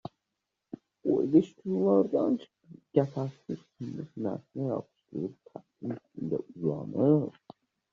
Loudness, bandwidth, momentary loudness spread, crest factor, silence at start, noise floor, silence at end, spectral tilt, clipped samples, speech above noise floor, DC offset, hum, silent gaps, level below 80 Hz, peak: -30 LUFS; 7.2 kHz; 16 LU; 20 dB; 1.05 s; -85 dBFS; 0.6 s; -10 dB/octave; under 0.1%; 55 dB; under 0.1%; none; none; -72 dBFS; -10 dBFS